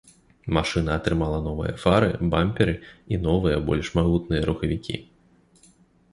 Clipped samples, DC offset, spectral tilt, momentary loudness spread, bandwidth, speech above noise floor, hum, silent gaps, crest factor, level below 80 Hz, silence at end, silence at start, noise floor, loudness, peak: under 0.1%; under 0.1%; -7 dB/octave; 9 LU; 11.5 kHz; 35 dB; none; none; 20 dB; -36 dBFS; 1.1 s; 0.45 s; -58 dBFS; -24 LUFS; -4 dBFS